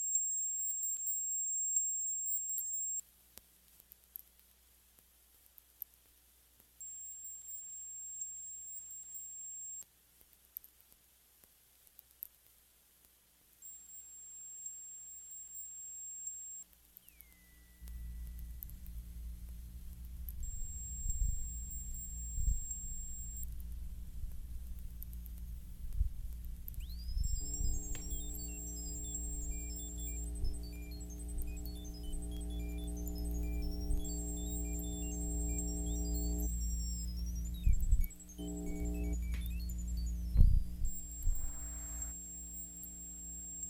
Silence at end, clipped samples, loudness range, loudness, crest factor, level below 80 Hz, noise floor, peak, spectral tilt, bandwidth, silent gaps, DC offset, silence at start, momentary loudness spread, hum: 0 s; under 0.1%; 13 LU; -41 LUFS; 28 dB; -40 dBFS; -68 dBFS; -12 dBFS; -4 dB/octave; 17 kHz; none; under 0.1%; 0 s; 16 LU; 60 Hz at -65 dBFS